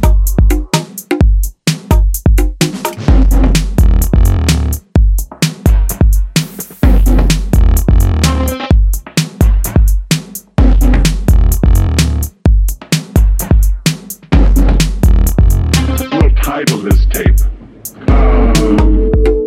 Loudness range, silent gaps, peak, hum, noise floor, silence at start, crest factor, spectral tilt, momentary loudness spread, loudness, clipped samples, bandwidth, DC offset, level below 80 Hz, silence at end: 1 LU; none; 0 dBFS; none; -30 dBFS; 0 s; 10 dB; -5.5 dB/octave; 6 LU; -12 LUFS; under 0.1%; 16 kHz; under 0.1%; -10 dBFS; 0 s